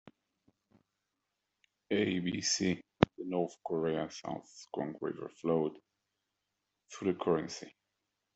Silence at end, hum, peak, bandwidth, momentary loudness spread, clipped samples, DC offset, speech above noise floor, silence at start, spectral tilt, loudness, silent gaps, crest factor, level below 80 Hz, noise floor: 0.65 s; none; -4 dBFS; 8.2 kHz; 12 LU; under 0.1%; under 0.1%; 51 dB; 0.05 s; -4.5 dB/octave; -35 LUFS; none; 34 dB; -66 dBFS; -86 dBFS